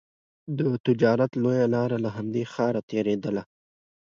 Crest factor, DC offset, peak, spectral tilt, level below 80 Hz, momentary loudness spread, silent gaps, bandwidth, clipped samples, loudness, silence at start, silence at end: 18 dB; under 0.1%; -8 dBFS; -8 dB/octave; -66 dBFS; 8 LU; 0.80-0.84 s, 2.83-2.88 s; 7.2 kHz; under 0.1%; -26 LUFS; 0.45 s; 0.7 s